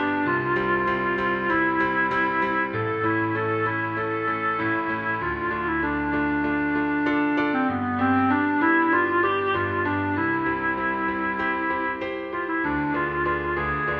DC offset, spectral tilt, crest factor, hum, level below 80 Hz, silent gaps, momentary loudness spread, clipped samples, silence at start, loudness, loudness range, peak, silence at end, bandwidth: under 0.1%; -8.5 dB/octave; 14 dB; none; -48 dBFS; none; 5 LU; under 0.1%; 0 s; -23 LUFS; 3 LU; -10 dBFS; 0 s; 5.8 kHz